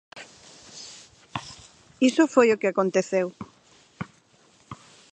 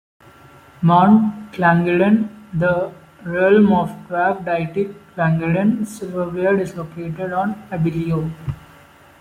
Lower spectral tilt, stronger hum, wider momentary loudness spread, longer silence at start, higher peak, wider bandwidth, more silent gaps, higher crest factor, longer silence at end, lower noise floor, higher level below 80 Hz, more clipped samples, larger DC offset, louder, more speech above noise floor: second, -5 dB/octave vs -8 dB/octave; neither; first, 26 LU vs 13 LU; second, 0.15 s vs 0.8 s; about the same, -4 dBFS vs -2 dBFS; second, 9 kHz vs 12 kHz; neither; first, 22 dB vs 16 dB; second, 0.4 s vs 0.6 s; first, -59 dBFS vs -46 dBFS; second, -66 dBFS vs -50 dBFS; neither; neither; second, -23 LUFS vs -18 LUFS; first, 38 dB vs 29 dB